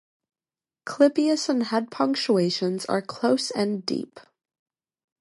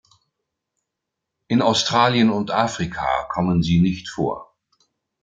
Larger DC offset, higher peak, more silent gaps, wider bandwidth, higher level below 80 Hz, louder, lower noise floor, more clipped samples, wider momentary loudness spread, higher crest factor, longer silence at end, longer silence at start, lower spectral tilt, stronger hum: neither; about the same, -6 dBFS vs -4 dBFS; neither; first, 11.5 kHz vs 9 kHz; second, -76 dBFS vs -48 dBFS; second, -24 LUFS vs -20 LUFS; first, under -90 dBFS vs -82 dBFS; neither; about the same, 10 LU vs 9 LU; about the same, 20 dB vs 18 dB; first, 1 s vs 0.8 s; second, 0.85 s vs 1.5 s; about the same, -5 dB/octave vs -5.5 dB/octave; neither